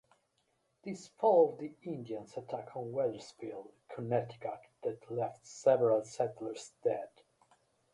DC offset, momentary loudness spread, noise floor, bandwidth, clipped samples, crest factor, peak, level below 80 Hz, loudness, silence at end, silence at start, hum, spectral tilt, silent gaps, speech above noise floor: under 0.1%; 17 LU; -78 dBFS; 11.5 kHz; under 0.1%; 20 dB; -14 dBFS; -80 dBFS; -35 LUFS; 0.85 s; 0.85 s; none; -6.5 dB/octave; none; 43 dB